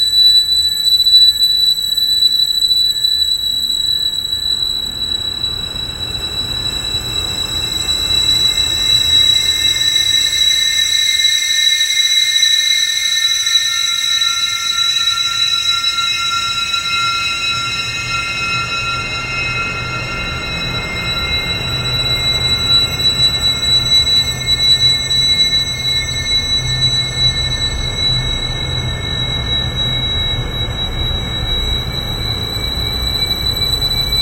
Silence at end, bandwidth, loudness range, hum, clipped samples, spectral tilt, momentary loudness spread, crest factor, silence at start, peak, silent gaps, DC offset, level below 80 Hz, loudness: 0 s; 16 kHz; 7 LU; none; under 0.1%; -1 dB/octave; 9 LU; 14 dB; 0 s; 0 dBFS; none; under 0.1%; -30 dBFS; -12 LUFS